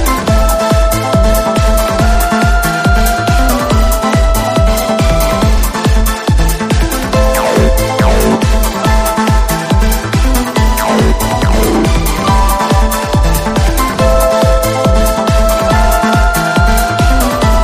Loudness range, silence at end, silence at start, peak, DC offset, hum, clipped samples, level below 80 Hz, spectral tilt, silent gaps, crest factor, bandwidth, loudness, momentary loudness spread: 1 LU; 0 s; 0 s; 0 dBFS; 0.3%; none; under 0.1%; -14 dBFS; -5 dB/octave; none; 10 dB; 15.5 kHz; -11 LUFS; 2 LU